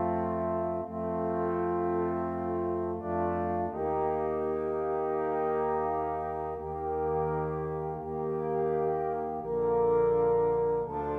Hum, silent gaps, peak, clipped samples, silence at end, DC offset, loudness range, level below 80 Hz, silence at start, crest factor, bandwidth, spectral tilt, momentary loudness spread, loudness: none; none; -18 dBFS; under 0.1%; 0 s; under 0.1%; 3 LU; -54 dBFS; 0 s; 12 dB; 3.6 kHz; -10.5 dB/octave; 8 LU; -31 LUFS